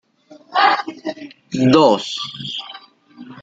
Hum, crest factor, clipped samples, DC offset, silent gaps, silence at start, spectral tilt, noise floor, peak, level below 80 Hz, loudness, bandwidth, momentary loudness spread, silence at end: none; 18 dB; under 0.1%; under 0.1%; none; 0.5 s; -5 dB/octave; -47 dBFS; -2 dBFS; -60 dBFS; -17 LUFS; 8 kHz; 17 LU; 0 s